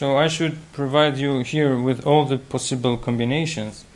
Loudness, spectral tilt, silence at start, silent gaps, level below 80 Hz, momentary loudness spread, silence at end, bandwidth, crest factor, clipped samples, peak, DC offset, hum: -21 LUFS; -5.5 dB/octave; 0 s; none; -50 dBFS; 7 LU; 0.15 s; 11.5 kHz; 18 dB; under 0.1%; -4 dBFS; under 0.1%; none